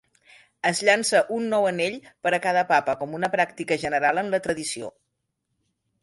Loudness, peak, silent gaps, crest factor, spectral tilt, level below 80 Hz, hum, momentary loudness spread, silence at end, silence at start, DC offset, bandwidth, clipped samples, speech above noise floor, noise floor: -23 LUFS; -4 dBFS; none; 20 dB; -3.5 dB/octave; -66 dBFS; none; 9 LU; 1.15 s; 0.65 s; under 0.1%; 11.5 kHz; under 0.1%; 54 dB; -78 dBFS